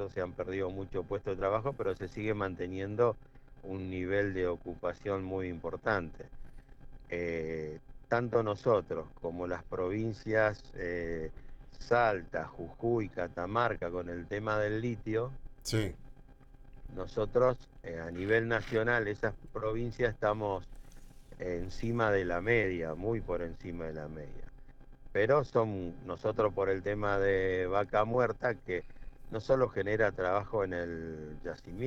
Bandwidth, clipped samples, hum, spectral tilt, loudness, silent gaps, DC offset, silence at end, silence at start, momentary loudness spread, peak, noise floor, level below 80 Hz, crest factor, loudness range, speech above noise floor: 12 kHz; under 0.1%; none; -7 dB/octave; -34 LUFS; none; under 0.1%; 0 s; 0 s; 12 LU; -14 dBFS; -54 dBFS; -50 dBFS; 20 dB; 4 LU; 21 dB